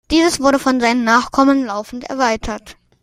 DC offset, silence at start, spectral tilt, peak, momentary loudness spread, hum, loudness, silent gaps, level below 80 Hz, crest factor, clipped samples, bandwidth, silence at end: under 0.1%; 0.1 s; -3.5 dB/octave; 0 dBFS; 13 LU; none; -15 LUFS; none; -40 dBFS; 16 dB; under 0.1%; 15 kHz; 0.3 s